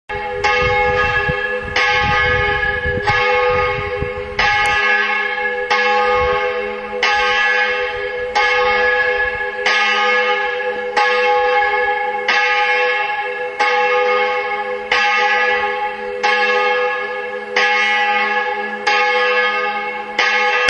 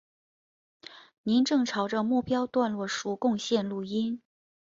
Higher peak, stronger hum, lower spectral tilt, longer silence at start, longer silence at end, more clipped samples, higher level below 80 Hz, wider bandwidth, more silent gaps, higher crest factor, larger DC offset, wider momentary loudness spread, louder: first, 0 dBFS vs -12 dBFS; neither; second, -3 dB/octave vs -5 dB/octave; second, 0.1 s vs 0.9 s; second, 0 s vs 0.5 s; neither; first, -40 dBFS vs -68 dBFS; first, 10.5 kHz vs 7.8 kHz; second, none vs 1.18-1.24 s; about the same, 16 dB vs 16 dB; neither; second, 7 LU vs 13 LU; first, -15 LUFS vs -28 LUFS